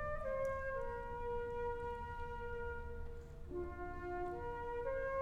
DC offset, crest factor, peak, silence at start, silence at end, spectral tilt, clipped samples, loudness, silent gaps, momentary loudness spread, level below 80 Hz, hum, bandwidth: under 0.1%; 14 dB; -30 dBFS; 0 s; 0 s; -7.5 dB/octave; under 0.1%; -44 LUFS; none; 8 LU; -50 dBFS; none; 12 kHz